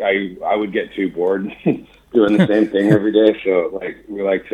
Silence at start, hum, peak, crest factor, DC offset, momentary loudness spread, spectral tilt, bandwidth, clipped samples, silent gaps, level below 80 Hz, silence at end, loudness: 0 s; none; 0 dBFS; 16 dB; under 0.1%; 10 LU; -8 dB/octave; 9.4 kHz; under 0.1%; none; -54 dBFS; 0.05 s; -17 LUFS